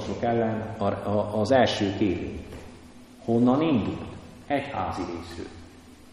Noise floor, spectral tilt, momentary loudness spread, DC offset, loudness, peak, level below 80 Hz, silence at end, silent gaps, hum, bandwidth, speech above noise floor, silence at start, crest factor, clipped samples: -48 dBFS; -6.5 dB/octave; 20 LU; under 0.1%; -26 LUFS; -8 dBFS; -50 dBFS; 0 s; none; none; 11.5 kHz; 23 dB; 0 s; 18 dB; under 0.1%